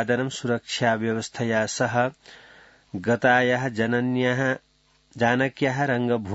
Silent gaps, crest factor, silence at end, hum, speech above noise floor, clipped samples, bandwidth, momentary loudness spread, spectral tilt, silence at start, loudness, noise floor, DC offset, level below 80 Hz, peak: none; 18 dB; 0 s; none; 38 dB; under 0.1%; 8 kHz; 8 LU; -5 dB/octave; 0 s; -24 LUFS; -61 dBFS; under 0.1%; -64 dBFS; -6 dBFS